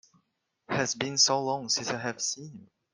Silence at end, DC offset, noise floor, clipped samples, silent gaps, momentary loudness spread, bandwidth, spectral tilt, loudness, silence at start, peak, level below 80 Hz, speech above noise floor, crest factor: 0.35 s; under 0.1%; -77 dBFS; under 0.1%; none; 11 LU; 11.5 kHz; -2 dB/octave; -27 LUFS; 0.7 s; -10 dBFS; -72 dBFS; 47 dB; 22 dB